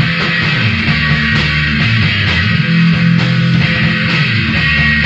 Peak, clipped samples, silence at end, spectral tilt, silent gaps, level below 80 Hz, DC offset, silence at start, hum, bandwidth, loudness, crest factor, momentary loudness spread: 0 dBFS; under 0.1%; 0 s; -6 dB/octave; none; -28 dBFS; under 0.1%; 0 s; none; 7.8 kHz; -11 LUFS; 12 dB; 2 LU